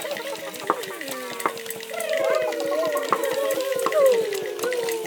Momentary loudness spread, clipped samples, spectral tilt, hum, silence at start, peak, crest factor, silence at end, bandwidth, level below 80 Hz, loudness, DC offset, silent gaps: 11 LU; under 0.1%; -2 dB/octave; none; 0 s; -2 dBFS; 22 dB; 0 s; over 20 kHz; -78 dBFS; -25 LUFS; under 0.1%; none